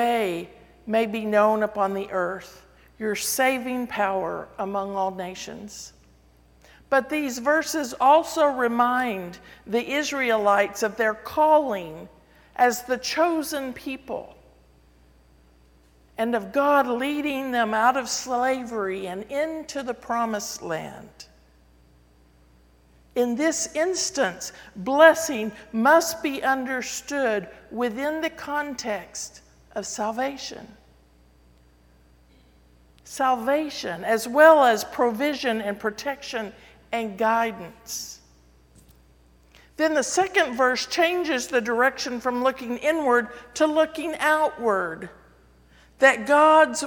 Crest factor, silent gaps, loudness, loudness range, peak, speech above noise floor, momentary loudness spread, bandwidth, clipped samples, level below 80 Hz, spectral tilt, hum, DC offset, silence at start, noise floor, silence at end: 22 dB; none; -23 LUFS; 9 LU; -2 dBFS; 33 dB; 16 LU; 19 kHz; under 0.1%; -58 dBFS; -3 dB/octave; none; under 0.1%; 0 s; -56 dBFS; 0 s